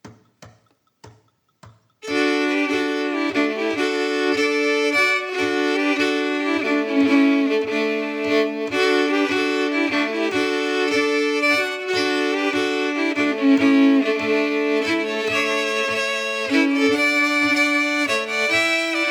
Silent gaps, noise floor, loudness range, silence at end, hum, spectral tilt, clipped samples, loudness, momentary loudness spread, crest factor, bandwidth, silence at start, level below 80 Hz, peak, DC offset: none; -61 dBFS; 3 LU; 0 s; none; -3 dB/octave; under 0.1%; -19 LUFS; 5 LU; 14 dB; 15.5 kHz; 0.05 s; -68 dBFS; -6 dBFS; under 0.1%